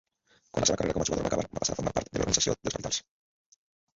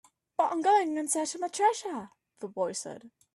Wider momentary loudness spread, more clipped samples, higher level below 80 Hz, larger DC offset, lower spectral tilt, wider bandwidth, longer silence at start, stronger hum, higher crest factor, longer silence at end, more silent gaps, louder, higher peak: second, 7 LU vs 17 LU; neither; first, -48 dBFS vs -80 dBFS; neither; about the same, -3 dB/octave vs -2.5 dB/octave; second, 8 kHz vs 12.5 kHz; first, 0.55 s vs 0.4 s; neither; first, 24 dB vs 18 dB; first, 1 s vs 0.25 s; neither; about the same, -29 LUFS vs -29 LUFS; first, -8 dBFS vs -14 dBFS